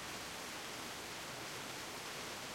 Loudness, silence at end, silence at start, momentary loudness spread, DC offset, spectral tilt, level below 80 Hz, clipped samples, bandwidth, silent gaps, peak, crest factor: -45 LUFS; 0 s; 0 s; 1 LU; under 0.1%; -2 dB/octave; -70 dBFS; under 0.1%; 16.5 kHz; none; -30 dBFS; 16 dB